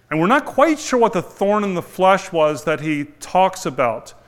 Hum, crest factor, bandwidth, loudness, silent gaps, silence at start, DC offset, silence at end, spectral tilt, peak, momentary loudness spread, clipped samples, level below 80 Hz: none; 18 dB; 16 kHz; -18 LUFS; none; 0.1 s; under 0.1%; 0.15 s; -5 dB/octave; 0 dBFS; 6 LU; under 0.1%; -52 dBFS